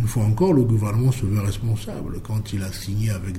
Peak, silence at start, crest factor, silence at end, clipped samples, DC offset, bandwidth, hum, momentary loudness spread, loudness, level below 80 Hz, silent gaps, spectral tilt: -8 dBFS; 0 s; 14 dB; 0 s; under 0.1%; under 0.1%; 15 kHz; none; 10 LU; -22 LUFS; -36 dBFS; none; -7 dB/octave